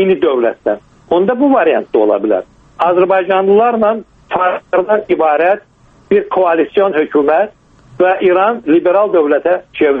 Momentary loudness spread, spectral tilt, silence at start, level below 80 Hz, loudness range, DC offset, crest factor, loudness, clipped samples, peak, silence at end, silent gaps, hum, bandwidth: 6 LU; -8 dB/octave; 0 s; -52 dBFS; 1 LU; under 0.1%; 12 dB; -13 LUFS; under 0.1%; 0 dBFS; 0 s; none; none; 4 kHz